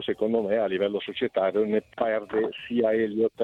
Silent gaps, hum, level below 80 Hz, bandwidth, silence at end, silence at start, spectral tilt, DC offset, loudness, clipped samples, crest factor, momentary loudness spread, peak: none; none; -66 dBFS; 4.5 kHz; 0 s; 0 s; -7.5 dB/octave; under 0.1%; -26 LUFS; under 0.1%; 14 dB; 4 LU; -12 dBFS